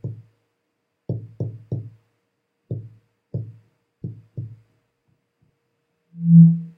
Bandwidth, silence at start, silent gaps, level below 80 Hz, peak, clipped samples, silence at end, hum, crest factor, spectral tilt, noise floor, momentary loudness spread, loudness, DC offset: 0.8 kHz; 0.05 s; none; -62 dBFS; -2 dBFS; under 0.1%; 0.1 s; none; 20 dB; -14.5 dB/octave; -75 dBFS; 28 LU; -19 LUFS; under 0.1%